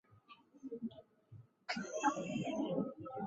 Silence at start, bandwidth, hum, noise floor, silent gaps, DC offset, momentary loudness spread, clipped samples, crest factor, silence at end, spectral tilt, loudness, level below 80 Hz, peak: 0.1 s; 8 kHz; none; -64 dBFS; none; under 0.1%; 24 LU; under 0.1%; 22 dB; 0 s; -4.5 dB/octave; -41 LUFS; -78 dBFS; -22 dBFS